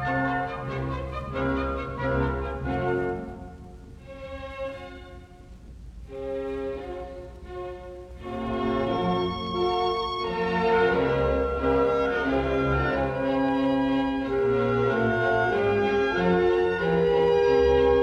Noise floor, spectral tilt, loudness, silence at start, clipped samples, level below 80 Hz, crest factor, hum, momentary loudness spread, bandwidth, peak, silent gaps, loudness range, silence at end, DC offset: -46 dBFS; -7.5 dB/octave; -25 LUFS; 0 s; under 0.1%; -40 dBFS; 14 dB; none; 18 LU; 9 kHz; -10 dBFS; none; 13 LU; 0 s; under 0.1%